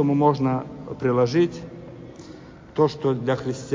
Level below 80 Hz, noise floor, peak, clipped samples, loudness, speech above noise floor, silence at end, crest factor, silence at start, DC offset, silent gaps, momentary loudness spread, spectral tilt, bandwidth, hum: -54 dBFS; -43 dBFS; -6 dBFS; under 0.1%; -23 LUFS; 21 dB; 0 s; 18 dB; 0 s; under 0.1%; none; 21 LU; -7.5 dB/octave; 7.6 kHz; none